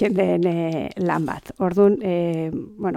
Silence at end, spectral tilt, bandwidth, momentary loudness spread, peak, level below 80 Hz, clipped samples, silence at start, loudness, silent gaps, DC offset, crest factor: 0 s; -8.5 dB/octave; 13.5 kHz; 9 LU; -4 dBFS; -54 dBFS; under 0.1%; 0 s; -22 LUFS; none; under 0.1%; 18 dB